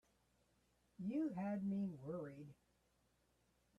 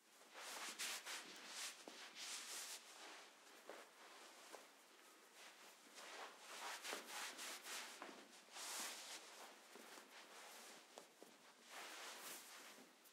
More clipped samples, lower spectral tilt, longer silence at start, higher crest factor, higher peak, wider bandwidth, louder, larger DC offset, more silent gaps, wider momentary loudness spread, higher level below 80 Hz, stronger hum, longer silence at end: neither; first, -9.5 dB/octave vs 1 dB/octave; first, 1 s vs 0 s; second, 14 dB vs 22 dB; about the same, -34 dBFS vs -34 dBFS; second, 7.2 kHz vs 16 kHz; first, -45 LUFS vs -54 LUFS; neither; neither; about the same, 13 LU vs 13 LU; first, -80 dBFS vs under -90 dBFS; neither; first, 1.25 s vs 0 s